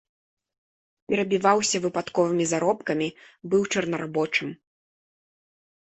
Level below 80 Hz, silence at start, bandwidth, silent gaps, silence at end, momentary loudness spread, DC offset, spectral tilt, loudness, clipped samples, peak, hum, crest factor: -66 dBFS; 1.1 s; 8.6 kHz; none; 1.4 s; 7 LU; under 0.1%; -4 dB/octave; -25 LUFS; under 0.1%; -6 dBFS; none; 20 dB